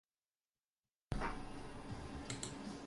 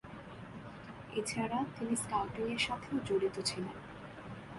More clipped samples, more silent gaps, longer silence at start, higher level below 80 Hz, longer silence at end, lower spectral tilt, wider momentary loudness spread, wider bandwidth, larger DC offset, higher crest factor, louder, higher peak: neither; neither; first, 1.1 s vs 0.05 s; first, -56 dBFS vs -62 dBFS; about the same, 0 s vs 0 s; about the same, -4.5 dB/octave vs -4 dB/octave; second, 7 LU vs 15 LU; about the same, 11.5 kHz vs 11.5 kHz; neither; about the same, 22 dB vs 18 dB; second, -47 LUFS vs -36 LUFS; second, -26 dBFS vs -20 dBFS